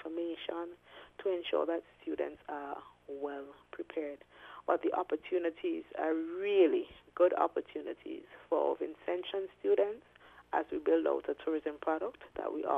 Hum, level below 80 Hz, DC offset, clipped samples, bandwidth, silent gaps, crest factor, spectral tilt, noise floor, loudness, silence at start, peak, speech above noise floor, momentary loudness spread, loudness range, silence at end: 60 Hz at -75 dBFS; -72 dBFS; under 0.1%; under 0.1%; 3.9 kHz; none; 20 dB; -6.5 dB/octave; -55 dBFS; -35 LUFS; 0 s; -14 dBFS; 20 dB; 16 LU; 6 LU; 0 s